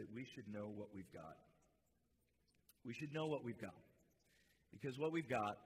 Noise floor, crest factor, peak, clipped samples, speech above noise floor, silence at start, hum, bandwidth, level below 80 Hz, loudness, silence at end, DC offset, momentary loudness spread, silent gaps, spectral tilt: -82 dBFS; 20 dB; -30 dBFS; under 0.1%; 35 dB; 0 s; none; 15.5 kHz; -82 dBFS; -48 LUFS; 0 s; under 0.1%; 16 LU; none; -6.5 dB/octave